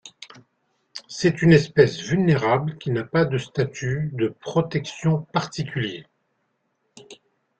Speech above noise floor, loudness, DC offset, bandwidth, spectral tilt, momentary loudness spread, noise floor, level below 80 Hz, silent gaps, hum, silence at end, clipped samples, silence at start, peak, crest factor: 51 dB; -22 LUFS; under 0.1%; 8.6 kHz; -6.5 dB/octave; 13 LU; -72 dBFS; -56 dBFS; none; none; 0.45 s; under 0.1%; 0.05 s; -2 dBFS; 22 dB